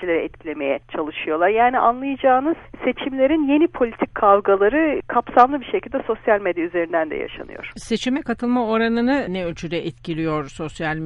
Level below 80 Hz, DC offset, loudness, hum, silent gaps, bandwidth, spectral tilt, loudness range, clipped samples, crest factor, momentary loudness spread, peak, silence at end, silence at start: -48 dBFS; under 0.1%; -20 LUFS; none; none; 11.5 kHz; -6 dB/octave; 5 LU; under 0.1%; 20 dB; 11 LU; 0 dBFS; 0 s; 0 s